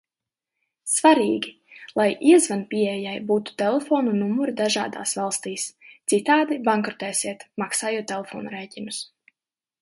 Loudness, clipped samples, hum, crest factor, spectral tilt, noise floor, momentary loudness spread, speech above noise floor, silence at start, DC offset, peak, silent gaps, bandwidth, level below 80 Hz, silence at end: -23 LUFS; under 0.1%; none; 20 dB; -3.5 dB/octave; under -90 dBFS; 15 LU; over 68 dB; 0.85 s; under 0.1%; -4 dBFS; none; 12 kHz; -72 dBFS; 0.75 s